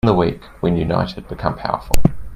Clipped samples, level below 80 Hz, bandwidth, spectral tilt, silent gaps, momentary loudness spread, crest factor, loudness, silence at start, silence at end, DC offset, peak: under 0.1%; -28 dBFS; 15.5 kHz; -7 dB/octave; none; 6 LU; 16 dB; -20 LUFS; 0.05 s; 0 s; under 0.1%; 0 dBFS